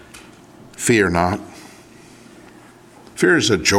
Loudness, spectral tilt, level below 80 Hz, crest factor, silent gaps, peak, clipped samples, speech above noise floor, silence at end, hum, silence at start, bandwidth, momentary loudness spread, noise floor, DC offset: -17 LUFS; -4 dB/octave; -48 dBFS; 20 dB; none; 0 dBFS; under 0.1%; 29 dB; 0 s; none; 0.15 s; 16.5 kHz; 23 LU; -45 dBFS; under 0.1%